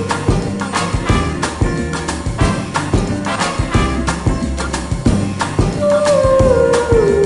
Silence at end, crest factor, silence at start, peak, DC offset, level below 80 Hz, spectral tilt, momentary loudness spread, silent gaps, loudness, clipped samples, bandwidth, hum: 0 s; 14 dB; 0 s; -2 dBFS; under 0.1%; -24 dBFS; -5.5 dB/octave; 8 LU; none; -16 LUFS; under 0.1%; 11.5 kHz; none